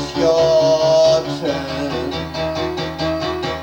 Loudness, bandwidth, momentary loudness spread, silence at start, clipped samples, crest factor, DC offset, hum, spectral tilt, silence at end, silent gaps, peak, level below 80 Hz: -17 LUFS; 19 kHz; 10 LU; 0 s; under 0.1%; 14 dB; under 0.1%; none; -5 dB/octave; 0 s; none; -4 dBFS; -40 dBFS